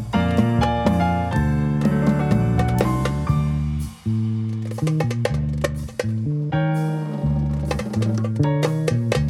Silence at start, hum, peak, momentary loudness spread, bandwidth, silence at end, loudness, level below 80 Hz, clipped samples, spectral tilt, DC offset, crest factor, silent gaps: 0 s; none; -6 dBFS; 6 LU; 13.5 kHz; 0 s; -21 LUFS; -32 dBFS; under 0.1%; -7.5 dB/octave; under 0.1%; 16 dB; none